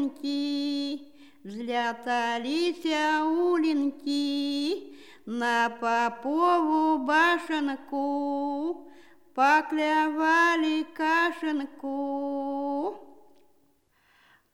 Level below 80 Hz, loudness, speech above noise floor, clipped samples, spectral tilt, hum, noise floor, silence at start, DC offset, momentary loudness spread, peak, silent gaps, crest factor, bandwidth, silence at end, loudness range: -80 dBFS; -27 LUFS; 41 dB; under 0.1%; -3 dB/octave; none; -67 dBFS; 0 s; 0.2%; 11 LU; -10 dBFS; none; 18 dB; 13 kHz; 1.5 s; 4 LU